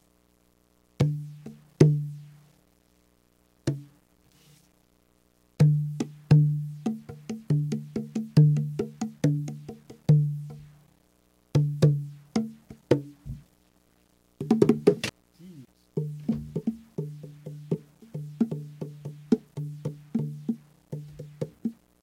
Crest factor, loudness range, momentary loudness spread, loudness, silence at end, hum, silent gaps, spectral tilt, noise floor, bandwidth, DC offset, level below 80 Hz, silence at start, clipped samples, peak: 26 dB; 8 LU; 21 LU; -27 LUFS; 0.3 s; 60 Hz at -55 dBFS; none; -8.5 dB/octave; -65 dBFS; 11 kHz; under 0.1%; -58 dBFS; 1 s; under 0.1%; -2 dBFS